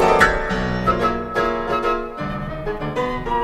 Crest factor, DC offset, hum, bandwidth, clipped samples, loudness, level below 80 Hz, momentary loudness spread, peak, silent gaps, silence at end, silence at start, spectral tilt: 20 dB; under 0.1%; none; 15.5 kHz; under 0.1%; -21 LUFS; -32 dBFS; 11 LU; 0 dBFS; none; 0 s; 0 s; -5.5 dB/octave